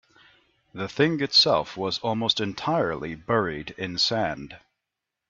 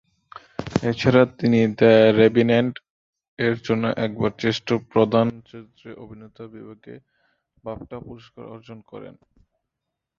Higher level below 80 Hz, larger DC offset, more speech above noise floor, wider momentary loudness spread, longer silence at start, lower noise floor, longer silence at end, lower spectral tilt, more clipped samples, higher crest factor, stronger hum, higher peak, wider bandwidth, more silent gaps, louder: about the same, -58 dBFS vs -54 dBFS; neither; about the same, 60 dB vs 62 dB; second, 15 LU vs 26 LU; first, 0.75 s vs 0.6 s; about the same, -85 dBFS vs -83 dBFS; second, 0.7 s vs 1.1 s; second, -4.5 dB/octave vs -7 dB/octave; neither; about the same, 20 dB vs 20 dB; neither; second, -8 dBFS vs -2 dBFS; about the same, 7.8 kHz vs 7.4 kHz; second, none vs 2.90-3.13 s, 3.28-3.37 s; second, -24 LUFS vs -19 LUFS